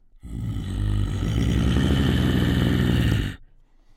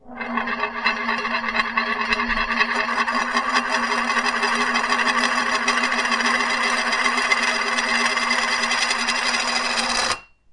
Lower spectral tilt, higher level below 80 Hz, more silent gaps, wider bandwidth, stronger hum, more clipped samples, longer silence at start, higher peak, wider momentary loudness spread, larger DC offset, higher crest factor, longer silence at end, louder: first, -6.5 dB/octave vs -0.5 dB/octave; first, -28 dBFS vs -48 dBFS; neither; first, 16 kHz vs 11.5 kHz; neither; neither; first, 0.25 s vs 0.05 s; second, -6 dBFS vs -2 dBFS; first, 11 LU vs 3 LU; neither; about the same, 16 dB vs 18 dB; first, 0.55 s vs 0.3 s; second, -23 LUFS vs -20 LUFS